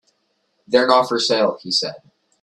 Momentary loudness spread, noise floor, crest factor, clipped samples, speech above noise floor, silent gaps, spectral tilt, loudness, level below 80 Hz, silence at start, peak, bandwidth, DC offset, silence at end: 6 LU; -68 dBFS; 20 dB; under 0.1%; 50 dB; none; -3 dB/octave; -18 LUFS; -64 dBFS; 0.7 s; 0 dBFS; 12 kHz; under 0.1%; 0.45 s